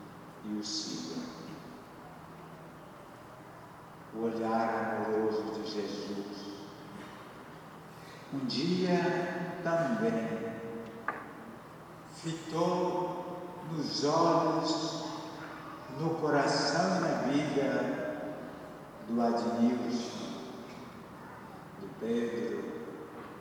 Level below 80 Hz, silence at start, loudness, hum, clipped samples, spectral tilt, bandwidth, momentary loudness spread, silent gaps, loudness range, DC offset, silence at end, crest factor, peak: -70 dBFS; 0 s; -33 LUFS; none; under 0.1%; -5 dB/octave; 20 kHz; 20 LU; none; 8 LU; under 0.1%; 0 s; 18 dB; -16 dBFS